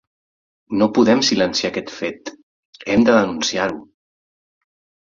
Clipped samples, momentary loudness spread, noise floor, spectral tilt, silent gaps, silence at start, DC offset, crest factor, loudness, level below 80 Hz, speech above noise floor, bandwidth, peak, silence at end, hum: under 0.1%; 19 LU; under -90 dBFS; -4 dB/octave; 2.43-2.73 s; 0.7 s; under 0.1%; 18 dB; -18 LUFS; -54 dBFS; over 73 dB; 7.6 kHz; -2 dBFS; 1.2 s; none